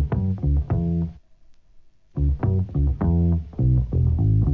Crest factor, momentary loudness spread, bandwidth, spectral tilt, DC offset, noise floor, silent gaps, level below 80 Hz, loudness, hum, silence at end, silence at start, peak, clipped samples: 12 dB; 6 LU; 2.9 kHz; -12.5 dB/octave; 0.2%; -51 dBFS; none; -26 dBFS; -23 LUFS; none; 0 s; 0 s; -10 dBFS; under 0.1%